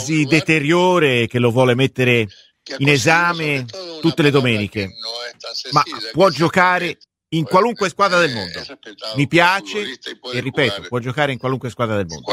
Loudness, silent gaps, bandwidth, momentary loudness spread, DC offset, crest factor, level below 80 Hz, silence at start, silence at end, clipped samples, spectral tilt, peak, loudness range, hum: -17 LUFS; none; 15.5 kHz; 13 LU; under 0.1%; 18 dB; -56 dBFS; 0 s; 0 s; under 0.1%; -5 dB/octave; 0 dBFS; 3 LU; none